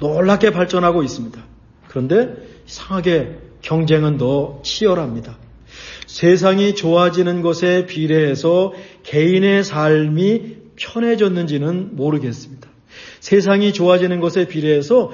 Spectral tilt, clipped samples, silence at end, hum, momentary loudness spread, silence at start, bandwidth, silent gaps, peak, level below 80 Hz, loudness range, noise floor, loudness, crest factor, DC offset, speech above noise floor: -6.5 dB/octave; under 0.1%; 0 s; none; 16 LU; 0 s; 7.4 kHz; none; -2 dBFS; -48 dBFS; 4 LU; -40 dBFS; -16 LUFS; 16 dB; under 0.1%; 25 dB